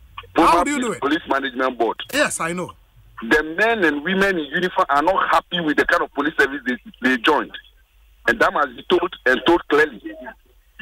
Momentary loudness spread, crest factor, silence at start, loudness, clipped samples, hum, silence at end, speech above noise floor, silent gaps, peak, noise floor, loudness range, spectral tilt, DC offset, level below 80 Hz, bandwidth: 9 LU; 16 dB; 0.15 s; -19 LUFS; under 0.1%; none; 0.5 s; 33 dB; none; -4 dBFS; -53 dBFS; 2 LU; -4 dB/octave; under 0.1%; -48 dBFS; 16 kHz